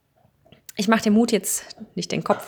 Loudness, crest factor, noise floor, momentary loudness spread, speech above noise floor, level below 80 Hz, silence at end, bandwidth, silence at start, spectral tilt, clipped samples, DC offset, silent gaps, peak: -22 LUFS; 22 dB; -60 dBFS; 15 LU; 38 dB; -62 dBFS; 0 s; over 20 kHz; 0.75 s; -4 dB/octave; under 0.1%; under 0.1%; none; -2 dBFS